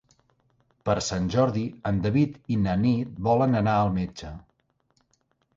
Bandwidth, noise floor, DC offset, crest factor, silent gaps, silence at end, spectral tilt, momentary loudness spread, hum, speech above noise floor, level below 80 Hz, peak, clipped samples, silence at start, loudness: 7.8 kHz; -70 dBFS; under 0.1%; 16 dB; none; 1.15 s; -7 dB/octave; 12 LU; none; 46 dB; -48 dBFS; -10 dBFS; under 0.1%; 0.85 s; -25 LUFS